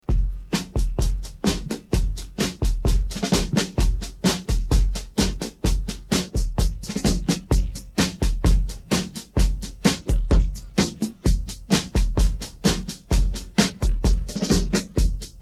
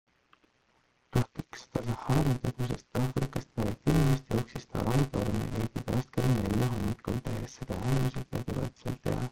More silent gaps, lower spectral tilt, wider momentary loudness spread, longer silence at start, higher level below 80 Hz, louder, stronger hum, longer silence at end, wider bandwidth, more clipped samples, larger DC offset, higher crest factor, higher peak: neither; second, -5 dB/octave vs -7 dB/octave; second, 5 LU vs 9 LU; second, 0.1 s vs 1.15 s; first, -24 dBFS vs -44 dBFS; first, -24 LUFS vs -32 LUFS; neither; about the same, 0 s vs 0 s; second, 14.5 kHz vs 17 kHz; neither; neither; about the same, 18 dB vs 18 dB; first, -4 dBFS vs -12 dBFS